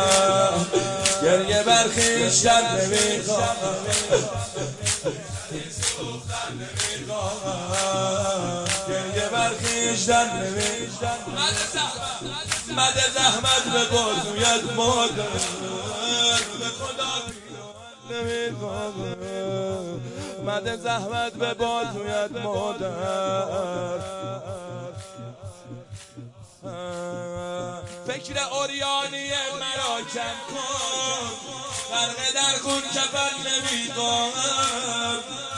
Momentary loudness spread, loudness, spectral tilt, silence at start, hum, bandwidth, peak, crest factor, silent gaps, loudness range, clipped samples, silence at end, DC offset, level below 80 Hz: 14 LU; -23 LUFS; -2 dB/octave; 0 s; none; 11.5 kHz; -2 dBFS; 22 dB; none; 10 LU; under 0.1%; 0 s; under 0.1%; -54 dBFS